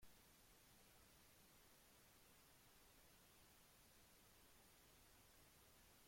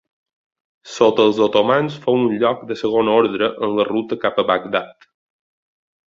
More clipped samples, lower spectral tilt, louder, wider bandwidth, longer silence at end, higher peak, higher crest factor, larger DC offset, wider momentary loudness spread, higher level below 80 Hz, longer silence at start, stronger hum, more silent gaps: neither; second, -2.5 dB/octave vs -5.5 dB/octave; second, -70 LUFS vs -18 LUFS; first, 16.5 kHz vs 7.6 kHz; second, 0 s vs 1.2 s; second, -54 dBFS vs 0 dBFS; about the same, 16 dB vs 18 dB; neither; second, 0 LU vs 8 LU; second, -80 dBFS vs -60 dBFS; second, 0 s vs 0.85 s; neither; neither